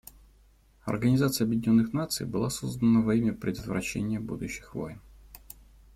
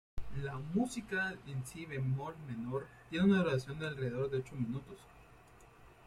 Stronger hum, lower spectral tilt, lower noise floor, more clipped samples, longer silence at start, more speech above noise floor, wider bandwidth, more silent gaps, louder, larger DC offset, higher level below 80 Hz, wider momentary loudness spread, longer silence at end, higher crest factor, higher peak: neither; about the same, -6 dB/octave vs -6.5 dB/octave; about the same, -60 dBFS vs -60 dBFS; neither; first, 0.85 s vs 0.15 s; first, 33 dB vs 23 dB; first, 16.5 kHz vs 13.5 kHz; neither; first, -28 LUFS vs -37 LUFS; neither; first, -52 dBFS vs -58 dBFS; about the same, 15 LU vs 13 LU; first, 0.55 s vs 0.15 s; about the same, 16 dB vs 18 dB; first, -12 dBFS vs -20 dBFS